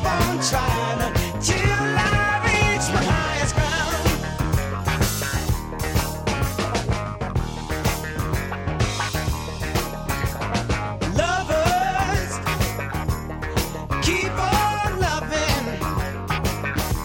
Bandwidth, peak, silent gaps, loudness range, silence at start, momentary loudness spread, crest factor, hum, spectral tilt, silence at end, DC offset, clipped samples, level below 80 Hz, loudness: 17 kHz; -6 dBFS; none; 5 LU; 0 s; 7 LU; 16 dB; none; -4.5 dB/octave; 0 s; under 0.1%; under 0.1%; -30 dBFS; -23 LUFS